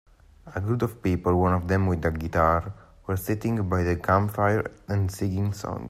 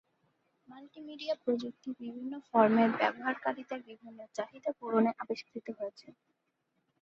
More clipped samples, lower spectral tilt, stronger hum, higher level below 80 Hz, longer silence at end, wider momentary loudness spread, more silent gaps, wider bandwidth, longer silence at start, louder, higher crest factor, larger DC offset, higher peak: neither; about the same, -7.5 dB/octave vs -6.5 dB/octave; neither; first, -46 dBFS vs -80 dBFS; second, 0 s vs 0.9 s; second, 8 LU vs 17 LU; neither; first, 15 kHz vs 7.6 kHz; second, 0.45 s vs 0.7 s; first, -25 LUFS vs -33 LUFS; second, 16 dB vs 24 dB; neither; first, -8 dBFS vs -12 dBFS